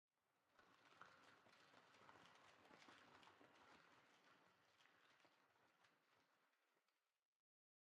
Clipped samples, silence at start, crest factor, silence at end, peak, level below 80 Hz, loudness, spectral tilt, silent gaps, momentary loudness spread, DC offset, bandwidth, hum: under 0.1%; 0.1 s; 26 dB; 0.8 s; -48 dBFS; under -90 dBFS; -69 LUFS; -3 dB/octave; none; 1 LU; under 0.1%; 8.4 kHz; none